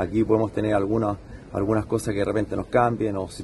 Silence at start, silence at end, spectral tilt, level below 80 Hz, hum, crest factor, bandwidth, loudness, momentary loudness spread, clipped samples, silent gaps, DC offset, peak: 0 s; 0 s; -7 dB/octave; -44 dBFS; none; 18 dB; 12 kHz; -24 LUFS; 7 LU; under 0.1%; none; under 0.1%; -6 dBFS